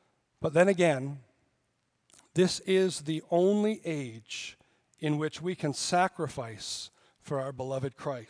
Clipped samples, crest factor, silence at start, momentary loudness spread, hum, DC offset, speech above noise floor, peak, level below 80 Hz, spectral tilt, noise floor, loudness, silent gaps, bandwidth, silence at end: under 0.1%; 20 dB; 0.4 s; 13 LU; none; under 0.1%; 47 dB; -10 dBFS; -70 dBFS; -5 dB/octave; -76 dBFS; -30 LUFS; none; 10.5 kHz; 0.05 s